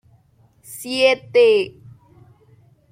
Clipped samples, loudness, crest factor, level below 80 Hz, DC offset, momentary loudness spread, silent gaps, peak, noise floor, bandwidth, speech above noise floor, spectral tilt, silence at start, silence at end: under 0.1%; -17 LUFS; 18 dB; -64 dBFS; under 0.1%; 19 LU; none; -2 dBFS; -56 dBFS; 16 kHz; 39 dB; -3 dB/octave; 0.7 s; 1.25 s